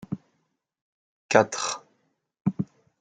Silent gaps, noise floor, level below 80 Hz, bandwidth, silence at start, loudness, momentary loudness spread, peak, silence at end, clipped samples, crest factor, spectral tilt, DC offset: 0.81-1.29 s, 2.41-2.45 s; -75 dBFS; -68 dBFS; 9.6 kHz; 0 s; -26 LUFS; 16 LU; 0 dBFS; 0.35 s; under 0.1%; 28 dB; -4.5 dB/octave; under 0.1%